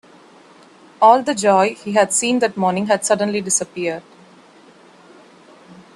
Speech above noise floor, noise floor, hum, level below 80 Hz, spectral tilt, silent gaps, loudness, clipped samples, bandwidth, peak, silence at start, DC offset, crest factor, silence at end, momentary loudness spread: 30 dB; -47 dBFS; none; -66 dBFS; -3.5 dB/octave; none; -17 LUFS; under 0.1%; 12.5 kHz; 0 dBFS; 1 s; under 0.1%; 20 dB; 0.2 s; 10 LU